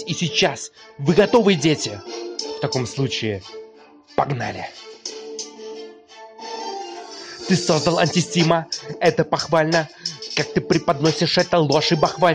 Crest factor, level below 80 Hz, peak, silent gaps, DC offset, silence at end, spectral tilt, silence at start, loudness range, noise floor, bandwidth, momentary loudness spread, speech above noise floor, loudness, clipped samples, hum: 16 dB; -56 dBFS; -4 dBFS; none; under 0.1%; 0 s; -4.5 dB/octave; 0 s; 10 LU; -47 dBFS; 10 kHz; 16 LU; 28 dB; -20 LUFS; under 0.1%; none